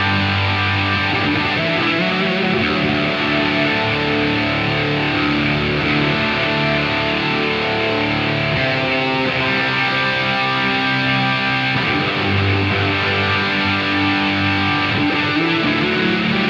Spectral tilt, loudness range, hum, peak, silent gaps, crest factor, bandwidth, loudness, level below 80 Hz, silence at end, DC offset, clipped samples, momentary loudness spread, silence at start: -6 dB/octave; 1 LU; none; -4 dBFS; none; 14 dB; 8 kHz; -16 LUFS; -44 dBFS; 0 s; under 0.1%; under 0.1%; 1 LU; 0 s